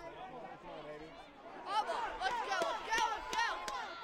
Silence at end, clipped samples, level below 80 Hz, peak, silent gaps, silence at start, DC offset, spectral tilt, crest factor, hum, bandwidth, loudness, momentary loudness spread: 0 s; under 0.1%; -64 dBFS; -18 dBFS; none; 0 s; under 0.1%; -1.5 dB/octave; 20 dB; none; 16 kHz; -37 LUFS; 15 LU